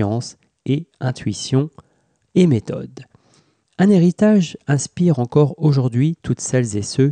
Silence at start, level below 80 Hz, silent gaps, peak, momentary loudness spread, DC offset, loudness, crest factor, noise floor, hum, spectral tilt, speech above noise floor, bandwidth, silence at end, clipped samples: 0 s; -54 dBFS; none; -4 dBFS; 12 LU; under 0.1%; -18 LUFS; 14 dB; -58 dBFS; none; -6.5 dB/octave; 41 dB; 9.8 kHz; 0 s; under 0.1%